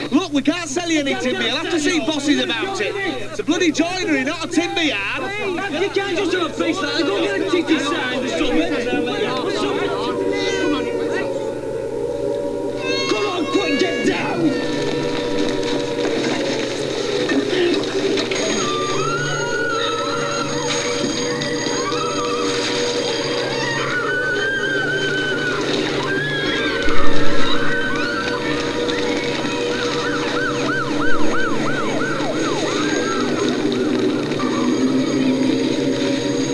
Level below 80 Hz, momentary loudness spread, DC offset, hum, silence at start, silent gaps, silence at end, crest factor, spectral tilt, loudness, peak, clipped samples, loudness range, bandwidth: -40 dBFS; 3 LU; 0.5%; none; 0 s; none; 0 s; 18 dB; -4 dB/octave; -20 LUFS; 0 dBFS; under 0.1%; 1 LU; 11 kHz